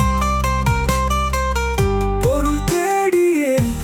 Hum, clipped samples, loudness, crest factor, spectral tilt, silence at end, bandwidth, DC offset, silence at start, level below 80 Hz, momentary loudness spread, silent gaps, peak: none; under 0.1%; -18 LUFS; 12 dB; -5.5 dB/octave; 0 s; 19 kHz; under 0.1%; 0 s; -24 dBFS; 3 LU; none; -4 dBFS